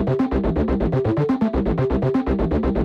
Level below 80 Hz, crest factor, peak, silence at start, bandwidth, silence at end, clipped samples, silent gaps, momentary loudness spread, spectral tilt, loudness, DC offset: -28 dBFS; 12 dB; -8 dBFS; 0 s; 6.8 kHz; 0 s; under 0.1%; none; 1 LU; -10 dB/octave; -21 LUFS; under 0.1%